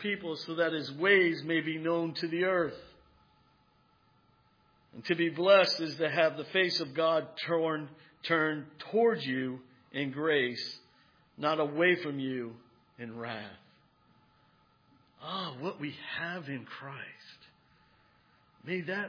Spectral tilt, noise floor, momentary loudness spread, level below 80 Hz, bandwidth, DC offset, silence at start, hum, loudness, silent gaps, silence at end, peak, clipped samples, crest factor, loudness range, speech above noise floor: -5.5 dB/octave; -68 dBFS; 18 LU; -78 dBFS; 5.2 kHz; under 0.1%; 0 s; none; -31 LUFS; none; 0 s; -10 dBFS; under 0.1%; 22 dB; 13 LU; 37 dB